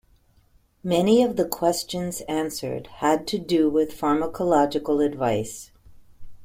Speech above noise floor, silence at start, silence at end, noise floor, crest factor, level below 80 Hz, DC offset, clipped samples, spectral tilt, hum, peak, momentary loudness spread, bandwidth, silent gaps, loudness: 37 dB; 0.85 s; 0 s; -60 dBFS; 18 dB; -52 dBFS; under 0.1%; under 0.1%; -5 dB/octave; none; -6 dBFS; 10 LU; 16.5 kHz; none; -23 LUFS